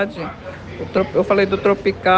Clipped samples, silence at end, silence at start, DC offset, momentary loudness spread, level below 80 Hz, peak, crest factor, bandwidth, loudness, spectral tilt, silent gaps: under 0.1%; 0 s; 0 s; under 0.1%; 15 LU; -46 dBFS; -2 dBFS; 16 dB; 7.6 kHz; -18 LUFS; -7 dB/octave; none